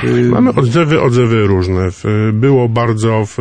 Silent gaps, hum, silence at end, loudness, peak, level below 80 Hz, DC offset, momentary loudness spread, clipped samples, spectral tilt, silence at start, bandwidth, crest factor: none; none; 0 s; -12 LUFS; -2 dBFS; -40 dBFS; under 0.1%; 4 LU; under 0.1%; -7.5 dB/octave; 0 s; 9.6 kHz; 10 dB